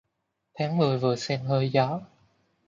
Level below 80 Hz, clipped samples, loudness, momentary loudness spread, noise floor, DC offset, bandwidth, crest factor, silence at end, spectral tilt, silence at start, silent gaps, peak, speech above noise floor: -68 dBFS; under 0.1%; -26 LUFS; 7 LU; -79 dBFS; under 0.1%; 7.6 kHz; 18 dB; 0.65 s; -6.5 dB/octave; 0.55 s; none; -10 dBFS; 54 dB